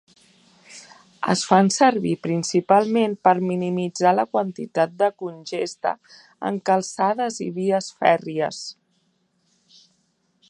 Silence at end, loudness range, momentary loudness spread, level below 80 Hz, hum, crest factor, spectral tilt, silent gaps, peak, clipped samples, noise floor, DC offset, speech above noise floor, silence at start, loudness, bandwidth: 1.75 s; 5 LU; 12 LU; -72 dBFS; none; 22 dB; -5 dB/octave; none; 0 dBFS; under 0.1%; -68 dBFS; under 0.1%; 47 dB; 0.7 s; -21 LUFS; 11 kHz